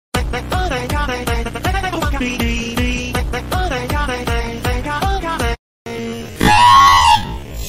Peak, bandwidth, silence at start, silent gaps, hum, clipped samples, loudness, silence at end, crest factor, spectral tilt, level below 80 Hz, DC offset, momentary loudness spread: -2 dBFS; 16 kHz; 0.15 s; 5.59-5.85 s; none; under 0.1%; -16 LUFS; 0 s; 14 dB; -4 dB/octave; -24 dBFS; under 0.1%; 14 LU